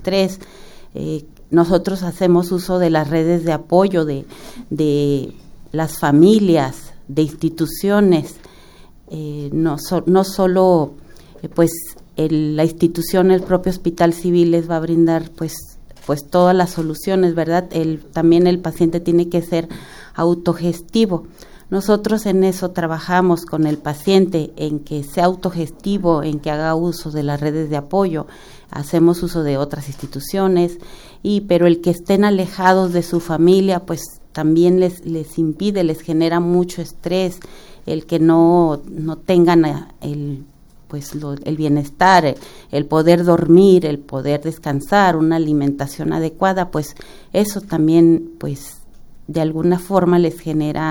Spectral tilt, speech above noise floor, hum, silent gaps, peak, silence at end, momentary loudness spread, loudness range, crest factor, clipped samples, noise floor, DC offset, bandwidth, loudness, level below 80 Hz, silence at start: -7 dB/octave; 26 dB; none; none; 0 dBFS; 0 s; 14 LU; 4 LU; 16 dB; under 0.1%; -42 dBFS; under 0.1%; over 20 kHz; -17 LUFS; -42 dBFS; 0 s